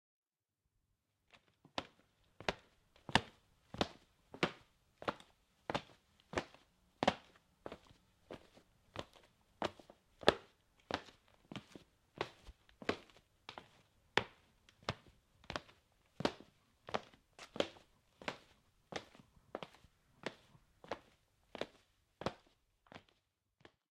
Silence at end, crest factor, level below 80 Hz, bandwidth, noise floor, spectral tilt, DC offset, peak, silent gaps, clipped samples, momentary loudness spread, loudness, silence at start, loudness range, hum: 0.95 s; 38 dB; -70 dBFS; 16 kHz; -90 dBFS; -4 dB/octave; under 0.1%; -8 dBFS; none; under 0.1%; 23 LU; -43 LUFS; 1.75 s; 9 LU; none